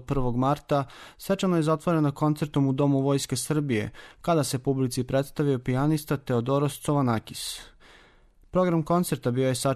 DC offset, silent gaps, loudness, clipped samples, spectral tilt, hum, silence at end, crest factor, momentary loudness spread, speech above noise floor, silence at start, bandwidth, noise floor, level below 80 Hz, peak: under 0.1%; none; -26 LUFS; under 0.1%; -6 dB/octave; none; 0 s; 14 dB; 6 LU; 31 dB; 0 s; 13.5 kHz; -57 dBFS; -48 dBFS; -12 dBFS